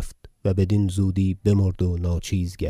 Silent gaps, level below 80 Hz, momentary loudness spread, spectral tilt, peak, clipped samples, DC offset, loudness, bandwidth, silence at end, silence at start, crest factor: none; -38 dBFS; 6 LU; -7.5 dB/octave; -8 dBFS; under 0.1%; under 0.1%; -23 LUFS; 12 kHz; 0 s; 0 s; 14 dB